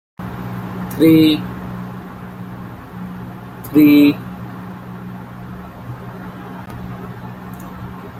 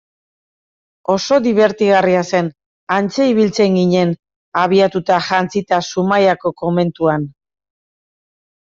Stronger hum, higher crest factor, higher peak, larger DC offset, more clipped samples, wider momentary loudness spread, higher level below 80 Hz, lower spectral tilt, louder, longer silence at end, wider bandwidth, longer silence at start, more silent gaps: neither; about the same, 18 dB vs 14 dB; about the same, -2 dBFS vs -2 dBFS; neither; neither; first, 22 LU vs 7 LU; first, -46 dBFS vs -56 dBFS; about the same, -7 dB/octave vs -6 dB/octave; about the same, -15 LUFS vs -15 LUFS; second, 0 s vs 1.35 s; first, 16 kHz vs 7.6 kHz; second, 0.2 s vs 1.1 s; second, none vs 2.66-2.87 s, 4.36-4.52 s